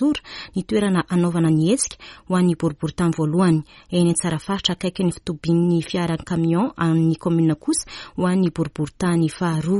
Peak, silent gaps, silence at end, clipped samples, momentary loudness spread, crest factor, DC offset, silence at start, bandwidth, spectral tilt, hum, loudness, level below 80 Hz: -4 dBFS; none; 0 s; under 0.1%; 7 LU; 16 dB; under 0.1%; 0 s; 11.5 kHz; -6 dB/octave; none; -21 LUFS; -48 dBFS